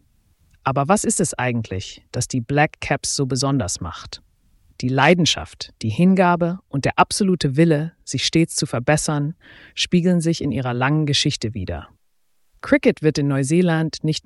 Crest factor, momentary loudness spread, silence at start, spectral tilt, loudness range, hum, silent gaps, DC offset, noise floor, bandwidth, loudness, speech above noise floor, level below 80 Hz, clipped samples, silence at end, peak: 18 dB; 13 LU; 0.65 s; -5 dB/octave; 3 LU; none; none; under 0.1%; -63 dBFS; 12 kHz; -20 LUFS; 44 dB; -48 dBFS; under 0.1%; 0.05 s; -2 dBFS